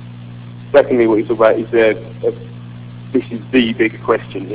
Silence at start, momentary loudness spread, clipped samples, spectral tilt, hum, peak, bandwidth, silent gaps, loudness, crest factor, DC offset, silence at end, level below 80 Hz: 0 s; 20 LU; 0.1%; -10 dB/octave; 60 Hz at -30 dBFS; 0 dBFS; 4 kHz; none; -15 LUFS; 16 dB; under 0.1%; 0 s; -50 dBFS